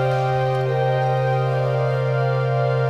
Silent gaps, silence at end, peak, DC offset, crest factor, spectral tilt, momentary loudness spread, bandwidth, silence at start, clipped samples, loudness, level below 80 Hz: none; 0 s; -10 dBFS; 0.3%; 10 dB; -8 dB/octave; 1 LU; 6.6 kHz; 0 s; under 0.1%; -20 LUFS; -54 dBFS